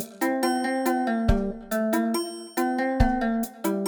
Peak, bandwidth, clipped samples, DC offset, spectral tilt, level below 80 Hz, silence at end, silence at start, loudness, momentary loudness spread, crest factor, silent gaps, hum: -8 dBFS; over 20 kHz; under 0.1%; under 0.1%; -5.5 dB/octave; -34 dBFS; 0 s; 0 s; -26 LUFS; 5 LU; 18 dB; none; none